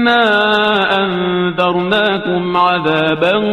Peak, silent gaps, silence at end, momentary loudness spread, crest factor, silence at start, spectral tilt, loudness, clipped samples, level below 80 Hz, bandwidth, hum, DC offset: 0 dBFS; none; 0 s; 5 LU; 12 dB; 0 s; -6.5 dB/octave; -13 LUFS; under 0.1%; -52 dBFS; 10.5 kHz; none; 0.3%